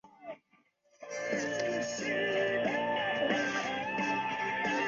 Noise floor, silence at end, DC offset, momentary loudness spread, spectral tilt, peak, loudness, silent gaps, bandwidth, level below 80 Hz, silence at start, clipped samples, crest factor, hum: -70 dBFS; 0 s; under 0.1%; 17 LU; -2 dB/octave; -16 dBFS; -32 LUFS; none; 7.6 kHz; -70 dBFS; 0.05 s; under 0.1%; 16 dB; none